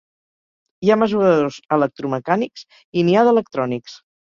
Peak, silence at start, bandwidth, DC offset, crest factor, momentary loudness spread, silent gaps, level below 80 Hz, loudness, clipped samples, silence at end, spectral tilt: -2 dBFS; 0.8 s; 7.4 kHz; under 0.1%; 18 dB; 10 LU; 2.85-2.92 s; -62 dBFS; -18 LUFS; under 0.1%; 0.35 s; -7 dB/octave